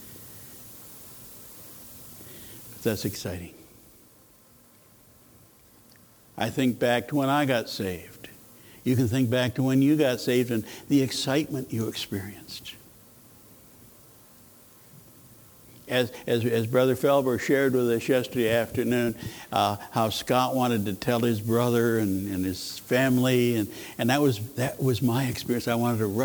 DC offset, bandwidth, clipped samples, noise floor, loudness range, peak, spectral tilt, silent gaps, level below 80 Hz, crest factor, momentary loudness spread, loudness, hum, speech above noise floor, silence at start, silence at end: under 0.1%; over 20 kHz; under 0.1%; -56 dBFS; 12 LU; -8 dBFS; -5.5 dB/octave; none; -60 dBFS; 20 dB; 20 LU; -26 LUFS; none; 31 dB; 0 s; 0 s